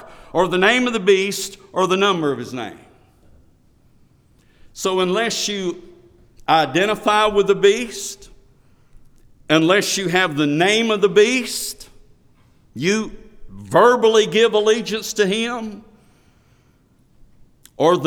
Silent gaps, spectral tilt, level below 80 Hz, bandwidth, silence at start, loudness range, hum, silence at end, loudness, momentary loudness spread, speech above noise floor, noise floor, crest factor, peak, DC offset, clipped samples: none; -3.5 dB/octave; -50 dBFS; 19 kHz; 0 s; 7 LU; none; 0 s; -18 LUFS; 14 LU; 39 dB; -56 dBFS; 18 dB; -2 dBFS; under 0.1%; under 0.1%